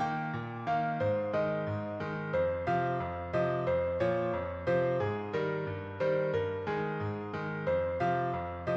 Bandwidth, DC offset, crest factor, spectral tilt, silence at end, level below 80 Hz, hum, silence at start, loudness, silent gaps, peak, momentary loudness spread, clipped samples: 7.2 kHz; under 0.1%; 14 dB; -8.5 dB/octave; 0 s; -58 dBFS; none; 0 s; -33 LUFS; none; -18 dBFS; 6 LU; under 0.1%